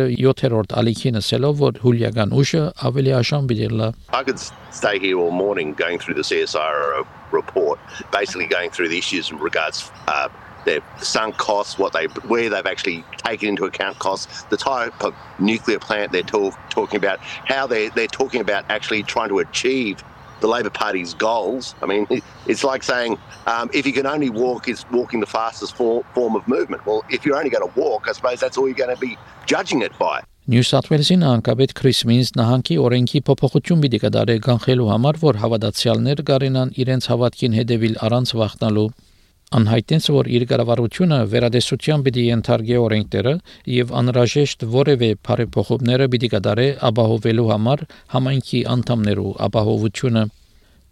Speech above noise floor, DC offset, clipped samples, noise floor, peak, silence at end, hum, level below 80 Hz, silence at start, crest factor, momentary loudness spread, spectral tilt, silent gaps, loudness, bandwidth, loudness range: 33 dB; under 0.1%; under 0.1%; -52 dBFS; 0 dBFS; 0.6 s; none; -50 dBFS; 0 s; 18 dB; 7 LU; -6 dB/octave; none; -19 LUFS; 13 kHz; 5 LU